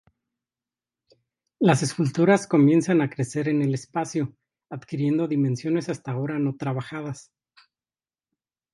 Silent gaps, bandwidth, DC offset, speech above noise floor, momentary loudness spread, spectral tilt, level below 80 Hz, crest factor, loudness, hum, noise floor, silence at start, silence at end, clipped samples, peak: none; 11.5 kHz; under 0.1%; over 67 dB; 15 LU; -6.5 dB/octave; -68 dBFS; 22 dB; -24 LUFS; none; under -90 dBFS; 1.6 s; 1.5 s; under 0.1%; -4 dBFS